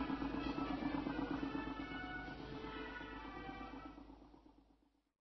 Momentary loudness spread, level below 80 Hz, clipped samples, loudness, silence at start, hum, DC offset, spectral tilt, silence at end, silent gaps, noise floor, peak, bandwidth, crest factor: 14 LU; -58 dBFS; under 0.1%; -45 LUFS; 0 s; none; under 0.1%; -4.5 dB/octave; 0.6 s; none; -74 dBFS; -28 dBFS; 6 kHz; 16 dB